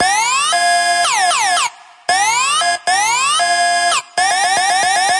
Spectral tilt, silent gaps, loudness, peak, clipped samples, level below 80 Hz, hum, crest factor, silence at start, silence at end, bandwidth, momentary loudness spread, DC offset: 1.5 dB/octave; none; -13 LUFS; -2 dBFS; under 0.1%; -62 dBFS; none; 12 dB; 0 s; 0 s; 11.5 kHz; 3 LU; under 0.1%